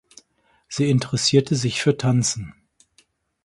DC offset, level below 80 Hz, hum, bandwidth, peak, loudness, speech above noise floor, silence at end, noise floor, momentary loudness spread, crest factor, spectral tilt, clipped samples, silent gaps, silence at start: under 0.1%; -54 dBFS; none; 11.5 kHz; -4 dBFS; -20 LUFS; 43 dB; 0.95 s; -63 dBFS; 13 LU; 18 dB; -5 dB/octave; under 0.1%; none; 0.7 s